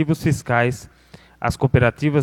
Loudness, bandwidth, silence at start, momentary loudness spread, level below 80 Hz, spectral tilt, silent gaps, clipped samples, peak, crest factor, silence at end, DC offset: -20 LUFS; 15 kHz; 0 s; 9 LU; -40 dBFS; -7 dB/octave; none; under 0.1%; -2 dBFS; 18 dB; 0 s; under 0.1%